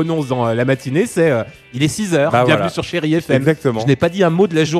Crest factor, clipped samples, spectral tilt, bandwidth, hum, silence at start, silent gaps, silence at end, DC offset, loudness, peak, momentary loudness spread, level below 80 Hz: 16 dB; under 0.1%; -6 dB/octave; 14 kHz; none; 0 s; none; 0 s; under 0.1%; -16 LUFS; 0 dBFS; 6 LU; -50 dBFS